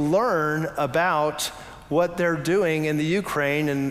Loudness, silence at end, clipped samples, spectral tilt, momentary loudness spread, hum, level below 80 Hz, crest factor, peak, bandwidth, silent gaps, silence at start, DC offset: -23 LUFS; 0 s; under 0.1%; -5.5 dB/octave; 5 LU; none; -54 dBFS; 14 dB; -10 dBFS; 16 kHz; none; 0 s; under 0.1%